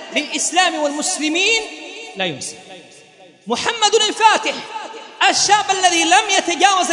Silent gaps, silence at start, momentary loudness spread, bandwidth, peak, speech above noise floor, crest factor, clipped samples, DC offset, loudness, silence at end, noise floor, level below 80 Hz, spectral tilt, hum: none; 0 s; 16 LU; 11 kHz; 0 dBFS; 29 dB; 18 dB; under 0.1%; under 0.1%; -15 LUFS; 0 s; -45 dBFS; -64 dBFS; -0.5 dB/octave; none